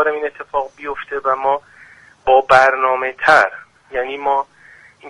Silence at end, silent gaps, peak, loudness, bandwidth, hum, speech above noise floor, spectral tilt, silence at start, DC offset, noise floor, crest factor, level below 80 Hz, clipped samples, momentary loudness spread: 0 s; none; 0 dBFS; -16 LUFS; 11.5 kHz; none; 30 dB; -3.5 dB/octave; 0 s; under 0.1%; -46 dBFS; 18 dB; -52 dBFS; under 0.1%; 15 LU